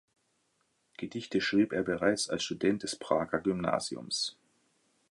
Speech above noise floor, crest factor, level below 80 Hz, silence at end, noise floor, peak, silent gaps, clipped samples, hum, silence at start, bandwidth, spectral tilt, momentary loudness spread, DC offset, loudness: 44 dB; 20 dB; -64 dBFS; 0.8 s; -75 dBFS; -12 dBFS; none; under 0.1%; none; 1 s; 11.5 kHz; -4 dB/octave; 7 LU; under 0.1%; -31 LUFS